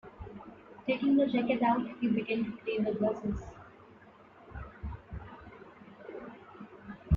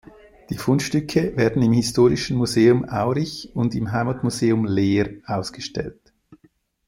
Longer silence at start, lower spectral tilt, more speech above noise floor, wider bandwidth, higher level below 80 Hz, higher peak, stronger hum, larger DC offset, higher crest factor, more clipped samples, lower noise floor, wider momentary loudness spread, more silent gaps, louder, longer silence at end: second, 0.05 s vs 0.5 s; first, -8.5 dB/octave vs -6 dB/octave; second, 26 dB vs 40 dB; second, 7.2 kHz vs 16 kHz; about the same, -48 dBFS vs -48 dBFS; second, -14 dBFS vs -4 dBFS; neither; neither; about the same, 20 dB vs 16 dB; neither; second, -56 dBFS vs -60 dBFS; first, 22 LU vs 11 LU; neither; second, -31 LUFS vs -21 LUFS; second, 0 s vs 0.55 s